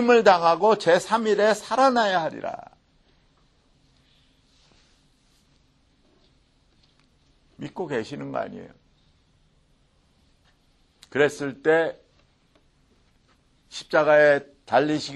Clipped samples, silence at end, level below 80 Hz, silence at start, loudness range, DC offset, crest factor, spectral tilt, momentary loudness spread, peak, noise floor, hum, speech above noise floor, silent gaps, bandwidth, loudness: under 0.1%; 0 s; -66 dBFS; 0 s; 15 LU; under 0.1%; 22 dB; -4.5 dB/octave; 19 LU; -2 dBFS; -63 dBFS; none; 42 dB; none; 12 kHz; -22 LUFS